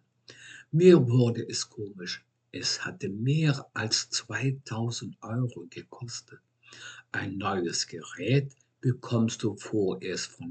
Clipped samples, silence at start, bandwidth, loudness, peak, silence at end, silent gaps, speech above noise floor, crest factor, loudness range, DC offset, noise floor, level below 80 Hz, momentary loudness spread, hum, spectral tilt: under 0.1%; 0.3 s; 9 kHz; -28 LUFS; -6 dBFS; 0 s; none; 24 dB; 22 dB; 8 LU; under 0.1%; -52 dBFS; -78 dBFS; 17 LU; none; -5 dB/octave